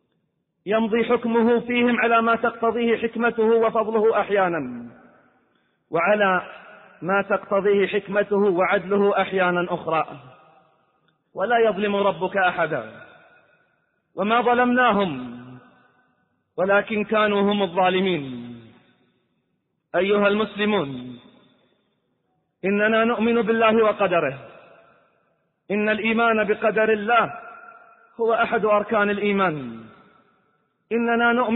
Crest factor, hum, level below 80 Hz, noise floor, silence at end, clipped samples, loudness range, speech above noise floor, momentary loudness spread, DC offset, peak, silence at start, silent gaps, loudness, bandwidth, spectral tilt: 16 dB; none; -62 dBFS; -73 dBFS; 0 s; under 0.1%; 4 LU; 53 dB; 14 LU; under 0.1%; -6 dBFS; 0.65 s; none; -21 LUFS; 4.1 kHz; -10 dB/octave